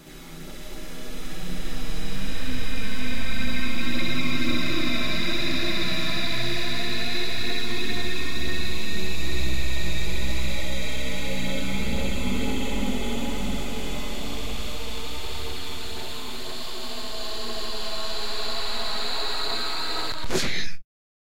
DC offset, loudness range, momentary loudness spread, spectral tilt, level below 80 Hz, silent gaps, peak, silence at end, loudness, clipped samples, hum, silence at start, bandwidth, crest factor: 10%; 7 LU; 8 LU; -3.5 dB/octave; -36 dBFS; none; -8 dBFS; 0.4 s; -29 LUFS; under 0.1%; none; 0 s; 16 kHz; 14 dB